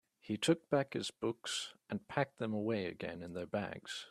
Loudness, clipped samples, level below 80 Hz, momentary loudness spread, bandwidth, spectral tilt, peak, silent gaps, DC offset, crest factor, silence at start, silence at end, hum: -38 LUFS; under 0.1%; -74 dBFS; 10 LU; 13.5 kHz; -4.5 dB/octave; -18 dBFS; none; under 0.1%; 20 dB; 0.25 s; 0 s; none